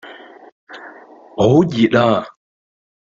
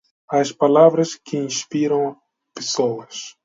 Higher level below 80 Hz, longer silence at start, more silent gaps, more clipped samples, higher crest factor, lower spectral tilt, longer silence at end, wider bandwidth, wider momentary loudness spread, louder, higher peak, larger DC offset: first, -52 dBFS vs -72 dBFS; second, 0.05 s vs 0.3 s; first, 0.52-0.67 s vs none; neither; about the same, 18 dB vs 20 dB; first, -7.5 dB/octave vs -4.5 dB/octave; first, 0.9 s vs 0.15 s; about the same, 7.6 kHz vs 7.8 kHz; first, 23 LU vs 14 LU; first, -15 LUFS vs -19 LUFS; about the same, -2 dBFS vs 0 dBFS; neither